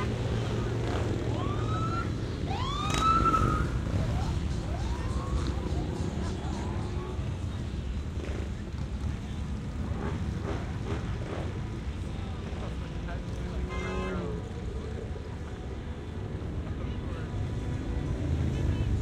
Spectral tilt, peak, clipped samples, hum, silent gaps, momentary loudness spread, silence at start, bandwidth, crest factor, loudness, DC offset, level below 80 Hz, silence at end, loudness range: -6.5 dB/octave; -14 dBFS; under 0.1%; none; none; 7 LU; 0 s; 11.5 kHz; 18 dB; -33 LUFS; under 0.1%; -36 dBFS; 0 s; 7 LU